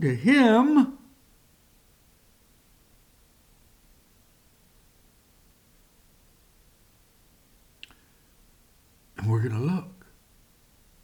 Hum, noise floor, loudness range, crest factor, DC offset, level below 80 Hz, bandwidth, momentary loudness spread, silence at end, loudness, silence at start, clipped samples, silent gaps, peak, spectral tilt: none; -60 dBFS; 12 LU; 22 dB; under 0.1%; -62 dBFS; 19 kHz; 31 LU; 1.15 s; -22 LUFS; 0 s; under 0.1%; none; -8 dBFS; -7 dB/octave